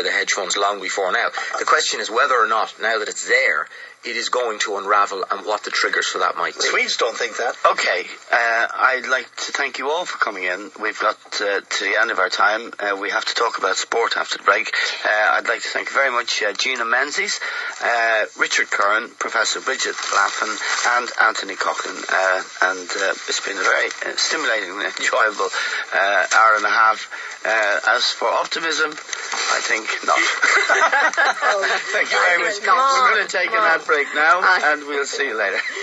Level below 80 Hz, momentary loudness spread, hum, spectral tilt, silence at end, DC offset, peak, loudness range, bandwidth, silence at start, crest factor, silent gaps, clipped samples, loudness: -80 dBFS; 7 LU; none; 0.5 dB/octave; 0 s; under 0.1%; -2 dBFS; 4 LU; 11.5 kHz; 0 s; 18 dB; none; under 0.1%; -18 LUFS